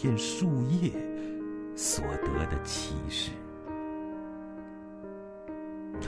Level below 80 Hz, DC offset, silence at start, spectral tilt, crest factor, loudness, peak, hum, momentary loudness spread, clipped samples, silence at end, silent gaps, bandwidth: -46 dBFS; under 0.1%; 0 s; -4.5 dB/octave; 18 dB; -33 LUFS; -14 dBFS; none; 15 LU; under 0.1%; 0 s; none; 11 kHz